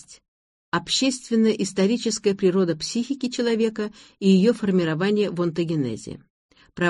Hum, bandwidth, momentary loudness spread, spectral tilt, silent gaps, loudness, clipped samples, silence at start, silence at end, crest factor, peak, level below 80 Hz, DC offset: none; 11.5 kHz; 9 LU; -5 dB/octave; 0.28-0.72 s, 6.30-6.49 s; -22 LUFS; under 0.1%; 0.1 s; 0 s; 16 dB; -8 dBFS; -60 dBFS; under 0.1%